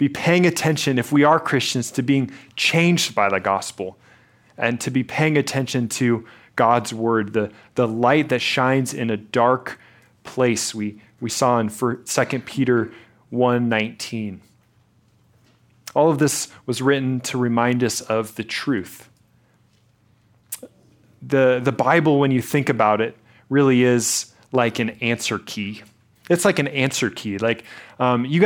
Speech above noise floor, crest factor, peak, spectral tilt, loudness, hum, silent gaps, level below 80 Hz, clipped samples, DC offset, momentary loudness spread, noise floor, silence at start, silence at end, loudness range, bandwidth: 39 dB; 20 dB; -2 dBFS; -5 dB/octave; -20 LUFS; none; none; -64 dBFS; under 0.1%; under 0.1%; 12 LU; -59 dBFS; 0 s; 0 s; 5 LU; 17.5 kHz